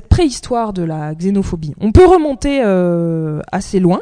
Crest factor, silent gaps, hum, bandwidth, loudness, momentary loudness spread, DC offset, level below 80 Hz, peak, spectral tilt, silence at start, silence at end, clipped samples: 14 dB; none; none; 10 kHz; -14 LUFS; 12 LU; under 0.1%; -26 dBFS; 0 dBFS; -7 dB/octave; 0.1 s; 0 s; 0.5%